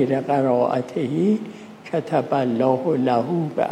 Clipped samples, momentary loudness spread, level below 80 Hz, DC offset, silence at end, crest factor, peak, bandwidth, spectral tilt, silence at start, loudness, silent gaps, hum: under 0.1%; 7 LU; -70 dBFS; under 0.1%; 0 s; 16 dB; -4 dBFS; 10.5 kHz; -8 dB/octave; 0 s; -21 LUFS; none; none